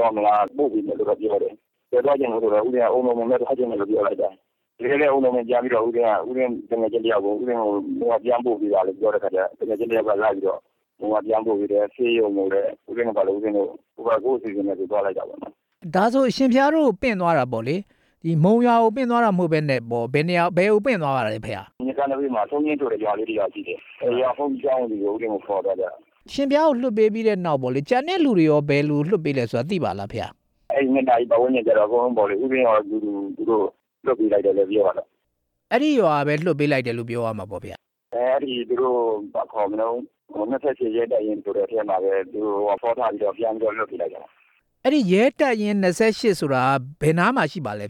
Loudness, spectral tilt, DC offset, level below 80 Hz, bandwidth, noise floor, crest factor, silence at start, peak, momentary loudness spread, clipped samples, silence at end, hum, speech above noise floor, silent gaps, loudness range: -22 LUFS; -7 dB/octave; under 0.1%; -60 dBFS; 12.5 kHz; -75 dBFS; 14 dB; 0 s; -6 dBFS; 9 LU; under 0.1%; 0 s; none; 54 dB; none; 4 LU